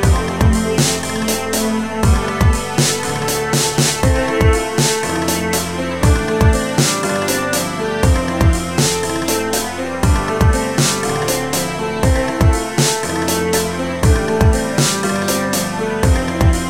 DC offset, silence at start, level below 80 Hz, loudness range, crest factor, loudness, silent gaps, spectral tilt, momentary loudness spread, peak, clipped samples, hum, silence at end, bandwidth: 1%; 0 s; -22 dBFS; 1 LU; 14 dB; -16 LUFS; none; -4.5 dB/octave; 4 LU; 0 dBFS; under 0.1%; none; 0 s; 17 kHz